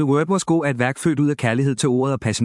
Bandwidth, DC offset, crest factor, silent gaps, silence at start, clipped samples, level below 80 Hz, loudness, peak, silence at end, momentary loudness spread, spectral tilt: 12 kHz; under 0.1%; 16 dB; none; 0 s; under 0.1%; -58 dBFS; -20 LUFS; -2 dBFS; 0 s; 2 LU; -6 dB/octave